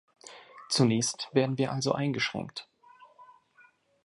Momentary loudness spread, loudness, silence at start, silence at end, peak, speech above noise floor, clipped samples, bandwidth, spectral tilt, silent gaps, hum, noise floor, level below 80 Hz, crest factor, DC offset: 23 LU; -28 LUFS; 0.25 s; 0.8 s; -10 dBFS; 34 dB; under 0.1%; 11.5 kHz; -4.5 dB/octave; none; none; -62 dBFS; -70 dBFS; 22 dB; under 0.1%